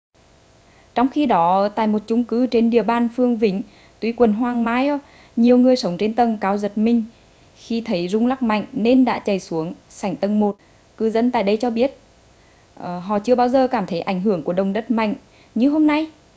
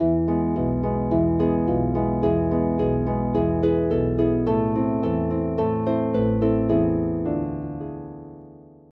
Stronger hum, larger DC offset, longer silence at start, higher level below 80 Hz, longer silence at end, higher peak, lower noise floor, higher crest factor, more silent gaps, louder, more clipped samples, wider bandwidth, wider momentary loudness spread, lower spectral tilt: neither; neither; first, 0.95 s vs 0 s; second, -56 dBFS vs -38 dBFS; about the same, 0.25 s vs 0.35 s; first, -2 dBFS vs -8 dBFS; first, -52 dBFS vs -46 dBFS; about the same, 18 dB vs 14 dB; neither; first, -19 LUFS vs -23 LUFS; neither; first, 8 kHz vs 4.3 kHz; first, 11 LU vs 8 LU; second, -7 dB/octave vs -12 dB/octave